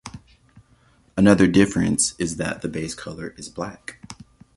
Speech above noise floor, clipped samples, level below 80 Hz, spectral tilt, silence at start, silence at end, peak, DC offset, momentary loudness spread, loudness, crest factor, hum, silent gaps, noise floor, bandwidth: 37 dB; under 0.1%; -48 dBFS; -5 dB/octave; 0.05 s; 0.45 s; -2 dBFS; under 0.1%; 24 LU; -21 LUFS; 22 dB; none; none; -58 dBFS; 11.5 kHz